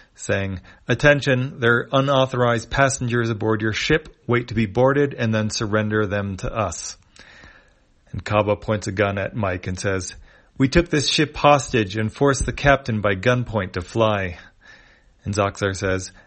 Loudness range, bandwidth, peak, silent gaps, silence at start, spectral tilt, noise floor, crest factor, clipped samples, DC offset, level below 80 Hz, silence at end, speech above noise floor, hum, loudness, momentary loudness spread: 6 LU; 8.8 kHz; 0 dBFS; none; 0.2 s; -5 dB/octave; -56 dBFS; 22 dB; under 0.1%; under 0.1%; -40 dBFS; 0.15 s; 36 dB; none; -21 LUFS; 9 LU